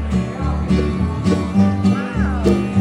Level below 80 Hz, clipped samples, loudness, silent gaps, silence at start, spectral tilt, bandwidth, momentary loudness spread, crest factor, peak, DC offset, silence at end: -28 dBFS; under 0.1%; -18 LUFS; none; 0 s; -8 dB/octave; 11 kHz; 5 LU; 14 dB; -4 dBFS; under 0.1%; 0 s